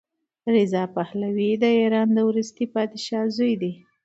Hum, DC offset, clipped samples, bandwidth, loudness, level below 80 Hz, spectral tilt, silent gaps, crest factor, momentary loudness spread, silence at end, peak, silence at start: none; under 0.1%; under 0.1%; 8 kHz; -23 LUFS; -72 dBFS; -6.5 dB/octave; none; 16 dB; 8 LU; 0.3 s; -8 dBFS; 0.45 s